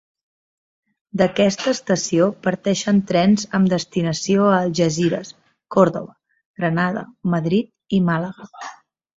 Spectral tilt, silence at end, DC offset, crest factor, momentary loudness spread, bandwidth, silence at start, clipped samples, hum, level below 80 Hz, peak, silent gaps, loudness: -5.5 dB/octave; 0.45 s; under 0.1%; 18 dB; 14 LU; 8 kHz; 1.15 s; under 0.1%; none; -58 dBFS; -2 dBFS; 6.46-6.54 s; -19 LUFS